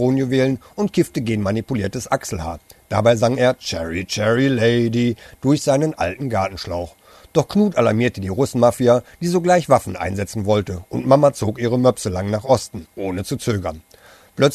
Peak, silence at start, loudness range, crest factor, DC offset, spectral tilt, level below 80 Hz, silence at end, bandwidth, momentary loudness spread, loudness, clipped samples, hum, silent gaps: 0 dBFS; 0 s; 3 LU; 18 dB; under 0.1%; -6 dB/octave; -46 dBFS; 0 s; 13.5 kHz; 10 LU; -19 LUFS; under 0.1%; none; none